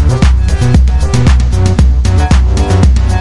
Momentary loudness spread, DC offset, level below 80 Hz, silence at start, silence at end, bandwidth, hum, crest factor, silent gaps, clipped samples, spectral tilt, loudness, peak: 2 LU; under 0.1%; -10 dBFS; 0 s; 0 s; 11.5 kHz; none; 8 dB; none; under 0.1%; -6.5 dB/octave; -10 LUFS; 0 dBFS